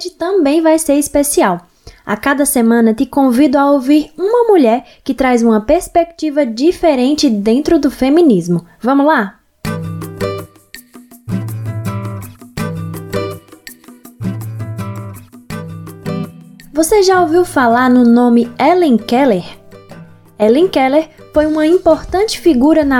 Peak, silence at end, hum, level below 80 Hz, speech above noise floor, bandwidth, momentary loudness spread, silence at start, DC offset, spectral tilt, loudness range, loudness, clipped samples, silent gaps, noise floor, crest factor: 0 dBFS; 0 s; none; -40 dBFS; 28 dB; 17.5 kHz; 15 LU; 0 s; under 0.1%; -5.5 dB/octave; 13 LU; -13 LUFS; under 0.1%; none; -39 dBFS; 12 dB